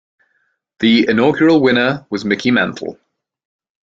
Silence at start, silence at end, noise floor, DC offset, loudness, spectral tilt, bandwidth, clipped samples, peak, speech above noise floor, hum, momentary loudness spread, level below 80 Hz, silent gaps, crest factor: 0.8 s; 1 s; -65 dBFS; under 0.1%; -14 LUFS; -6 dB/octave; 7.6 kHz; under 0.1%; -2 dBFS; 51 dB; none; 10 LU; -56 dBFS; none; 14 dB